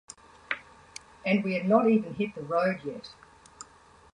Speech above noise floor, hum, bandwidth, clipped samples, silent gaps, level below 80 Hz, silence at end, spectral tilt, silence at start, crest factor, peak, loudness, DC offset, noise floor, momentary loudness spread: 30 dB; none; 10.5 kHz; under 0.1%; none; -66 dBFS; 0.5 s; -6.5 dB/octave; 0.5 s; 22 dB; -8 dBFS; -28 LUFS; under 0.1%; -56 dBFS; 25 LU